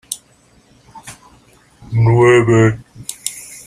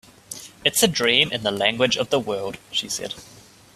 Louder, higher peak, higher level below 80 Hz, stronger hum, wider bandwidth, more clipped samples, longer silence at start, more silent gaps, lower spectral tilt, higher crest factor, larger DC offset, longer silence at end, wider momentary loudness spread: first, -13 LUFS vs -21 LUFS; about the same, -2 dBFS vs -2 dBFS; first, -46 dBFS vs -58 dBFS; first, 60 Hz at -35 dBFS vs none; about the same, 15 kHz vs 16 kHz; neither; second, 0.1 s vs 0.3 s; neither; first, -6 dB/octave vs -2.5 dB/octave; second, 16 dB vs 22 dB; neither; second, 0.1 s vs 0.35 s; first, 25 LU vs 19 LU